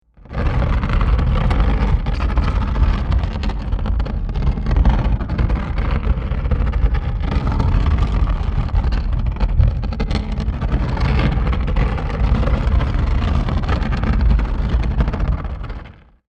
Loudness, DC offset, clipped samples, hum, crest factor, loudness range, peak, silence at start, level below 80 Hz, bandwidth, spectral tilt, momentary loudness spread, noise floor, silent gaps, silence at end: -20 LUFS; under 0.1%; under 0.1%; none; 14 dB; 1 LU; -2 dBFS; 0.3 s; -18 dBFS; 6.4 kHz; -8 dB/octave; 5 LU; -37 dBFS; none; 0.4 s